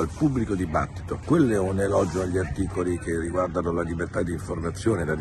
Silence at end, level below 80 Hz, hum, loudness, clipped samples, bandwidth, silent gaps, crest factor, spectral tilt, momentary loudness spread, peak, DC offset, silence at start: 0 s; -40 dBFS; none; -26 LUFS; under 0.1%; 12.5 kHz; none; 16 dB; -7 dB/octave; 7 LU; -8 dBFS; under 0.1%; 0 s